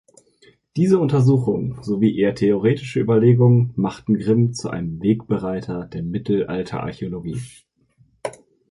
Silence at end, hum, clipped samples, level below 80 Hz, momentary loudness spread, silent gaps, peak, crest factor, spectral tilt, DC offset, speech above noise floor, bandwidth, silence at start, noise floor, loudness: 0.4 s; none; under 0.1%; -50 dBFS; 14 LU; none; -4 dBFS; 16 dB; -8.5 dB/octave; under 0.1%; 40 dB; 11.5 kHz; 0.75 s; -59 dBFS; -20 LUFS